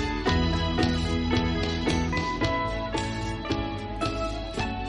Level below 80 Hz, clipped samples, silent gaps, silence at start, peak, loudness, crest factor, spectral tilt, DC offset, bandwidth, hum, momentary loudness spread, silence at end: -34 dBFS; under 0.1%; none; 0 s; -12 dBFS; -27 LUFS; 16 dB; -5.5 dB/octave; under 0.1%; 11 kHz; none; 6 LU; 0 s